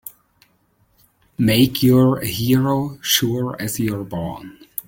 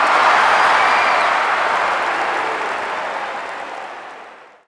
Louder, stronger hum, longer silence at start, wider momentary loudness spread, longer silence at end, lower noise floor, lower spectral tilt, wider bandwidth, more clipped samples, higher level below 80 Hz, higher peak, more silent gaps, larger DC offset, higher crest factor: about the same, -18 LUFS vs -16 LUFS; neither; about the same, 0.05 s vs 0 s; about the same, 16 LU vs 17 LU; second, 0.05 s vs 0.25 s; first, -61 dBFS vs -40 dBFS; first, -5 dB/octave vs -1.5 dB/octave; first, 17 kHz vs 11 kHz; neither; first, -50 dBFS vs -60 dBFS; about the same, -2 dBFS vs -2 dBFS; neither; neither; about the same, 18 dB vs 16 dB